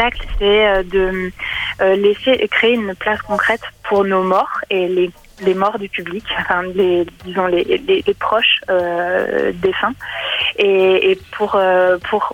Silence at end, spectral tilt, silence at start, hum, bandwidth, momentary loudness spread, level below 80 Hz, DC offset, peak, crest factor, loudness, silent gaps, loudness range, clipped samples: 0 s; -5.5 dB/octave; 0 s; none; 12 kHz; 8 LU; -36 dBFS; under 0.1%; 0 dBFS; 16 dB; -16 LUFS; none; 2 LU; under 0.1%